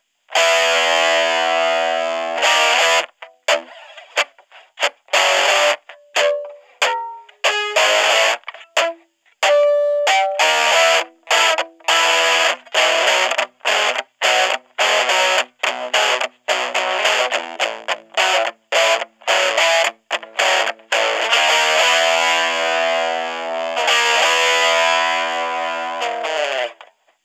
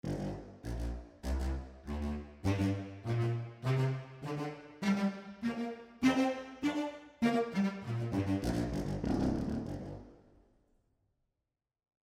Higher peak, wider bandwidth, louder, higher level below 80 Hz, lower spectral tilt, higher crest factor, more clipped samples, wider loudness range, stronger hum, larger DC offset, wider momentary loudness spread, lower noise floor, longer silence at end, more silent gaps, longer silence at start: first, 0 dBFS vs -16 dBFS; about the same, 15.5 kHz vs 15.5 kHz; first, -16 LUFS vs -36 LUFS; second, -84 dBFS vs -46 dBFS; second, 2.5 dB/octave vs -7 dB/octave; about the same, 18 dB vs 20 dB; neither; about the same, 3 LU vs 4 LU; neither; neither; about the same, 9 LU vs 10 LU; second, -48 dBFS vs -89 dBFS; second, 0.5 s vs 1.9 s; neither; first, 0.3 s vs 0.05 s